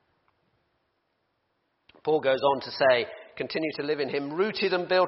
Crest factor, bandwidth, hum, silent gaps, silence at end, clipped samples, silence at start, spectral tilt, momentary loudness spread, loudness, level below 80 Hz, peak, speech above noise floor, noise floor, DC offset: 20 dB; 6 kHz; none; none; 0 s; under 0.1%; 2.05 s; -2 dB/octave; 10 LU; -27 LUFS; -72 dBFS; -8 dBFS; 50 dB; -75 dBFS; under 0.1%